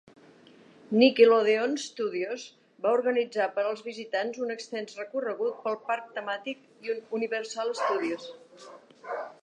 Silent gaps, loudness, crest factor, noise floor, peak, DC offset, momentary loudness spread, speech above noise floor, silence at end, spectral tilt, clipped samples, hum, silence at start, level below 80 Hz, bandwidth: none; -28 LUFS; 22 dB; -55 dBFS; -6 dBFS; under 0.1%; 16 LU; 27 dB; 0.1 s; -4 dB/octave; under 0.1%; none; 0.9 s; -86 dBFS; 9.4 kHz